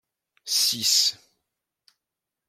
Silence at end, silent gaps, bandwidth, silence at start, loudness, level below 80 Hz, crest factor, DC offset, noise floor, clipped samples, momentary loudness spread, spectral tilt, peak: 1.35 s; none; 16.5 kHz; 0.45 s; -21 LUFS; -78 dBFS; 20 dB; under 0.1%; -86 dBFS; under 0.1%; 8 LU; 1.5 dB/octave; -8 dBFS